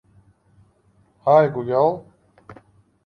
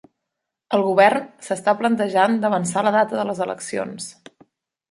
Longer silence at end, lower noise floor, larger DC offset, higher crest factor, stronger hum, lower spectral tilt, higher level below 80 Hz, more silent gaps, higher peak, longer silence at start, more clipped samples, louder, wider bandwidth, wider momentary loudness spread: second, 0.55 s vs 0.8 s; second, -60 dBFS vs -81 dBFS; neither; about the same, 20 dB vs 20 dB; neither; first, -9 dB/octave vs -4.5 dB/octave; first, -62 dBFS vs -68 dBFS; neither; about the same, -4 dBFS vs -2 dBFS; first, 1.25 s vs 0.7 s; neither; about the same, -19 LUFS vs -20 LUFS; second, 6 kHz vs 11.5 kHz; about the same, 10 LU vs 12 LU